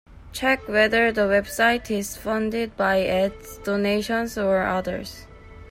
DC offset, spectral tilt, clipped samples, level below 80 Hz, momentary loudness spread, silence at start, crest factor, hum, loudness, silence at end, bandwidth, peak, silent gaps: under 0.1%; -4.5 dB/octave; under 0.1%; -46 dBFS; 11 LU; 0.1 s; 16 dB; none; -22 LUFS; 0 s; 16 kHz; -6 dBFS; none